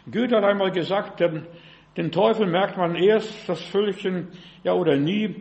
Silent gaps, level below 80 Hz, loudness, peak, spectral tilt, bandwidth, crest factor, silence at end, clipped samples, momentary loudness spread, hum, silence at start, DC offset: none; -64 dBFS; -23 LUFS; -6 dBFS; -7 dB/octave; 8.4 kHz; 16 dB; 0 s; under 0.1%; 10 LU; none; 0.05 s; under 0.1%